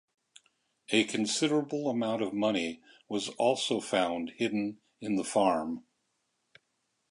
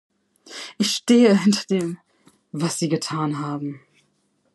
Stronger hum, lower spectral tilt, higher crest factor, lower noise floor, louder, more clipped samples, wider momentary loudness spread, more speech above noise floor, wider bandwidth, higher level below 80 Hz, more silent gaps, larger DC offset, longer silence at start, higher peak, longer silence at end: neither; about the same, -4 dB/octave vs -5 dB/octave; about the same, 20 dB vs 18 dB; first, -79 dBFS vs -67 dBFS; second, -30 LUFS vs -21 LUFS; neither; second, 10 LU vs 20 LU; about the same, 49 dB vs 47 dB; about the same, 11.5 kHz vs 12.5 kHz; about the same, -72 dBFS vs -74 dBFS; neither; neither; first, 0.9 s vs 0.5 s; second, -10 dBFS vs -4 dBFS; first, 1.3 s vs 0.75 s